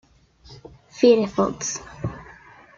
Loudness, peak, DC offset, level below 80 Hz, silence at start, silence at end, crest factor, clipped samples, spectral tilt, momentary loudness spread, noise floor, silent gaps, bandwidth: -22 LUFS; -4 dBFS; under 0.1%; -52 dBFS; 0.5 s; 0.55 s; 20 dB; under 0.1%; -5 dB/octave; 20 LU; -51 dBFS; none; 7.4 kHz